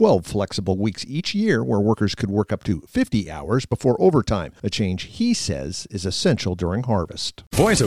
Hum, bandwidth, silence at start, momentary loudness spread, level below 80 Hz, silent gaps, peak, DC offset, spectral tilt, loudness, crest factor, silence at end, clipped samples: none; 15 kHz; 0 s; 8 LU; -42 dBFS; none; -4 dBFS; 0.3%; -5.5 dB/octave; -22 LUFS; 18 dB; 0 s; under 0.1%